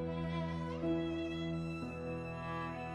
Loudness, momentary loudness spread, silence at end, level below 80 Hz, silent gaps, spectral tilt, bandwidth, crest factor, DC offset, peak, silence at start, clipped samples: -40 LUFS; 5 LU; 0 s; -56 dBFS; none; -7.5 dB/octave; 9 kHz; 12 dB; under 0.1%; -26 dBFS; 0 s; under 0.1%